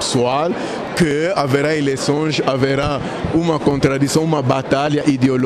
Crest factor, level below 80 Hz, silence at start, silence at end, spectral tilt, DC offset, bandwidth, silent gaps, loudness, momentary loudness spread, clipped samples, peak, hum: 12 dB; -42 dBFS; 0 s; 0 s; -5.5 dB/octave; under 0.1%; 13.5 kHz; none; -17 LUFS; 4 LU; under 0.1%; -4 dBFS; none